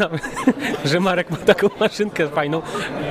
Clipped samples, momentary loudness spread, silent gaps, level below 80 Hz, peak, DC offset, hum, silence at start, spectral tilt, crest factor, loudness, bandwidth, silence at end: under 0.1%; 7 LU; none; -50 dBFS; -2 dBFS; under 0.1%; none; 0 s; -5.5 dB/octave; 18 dB; -20 LUFS; 15.5 kHz; 0 s